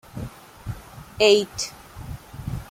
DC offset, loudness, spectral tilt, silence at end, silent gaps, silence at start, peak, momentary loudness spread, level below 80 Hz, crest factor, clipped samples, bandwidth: under 0.1%; -21 LUFS; -3.5 dB/octave; 0.05 s; none; 0.15 s; -4 dBFS; 22 LU; -44 dBFS; 22 dB; under 0.1%; 16 kHz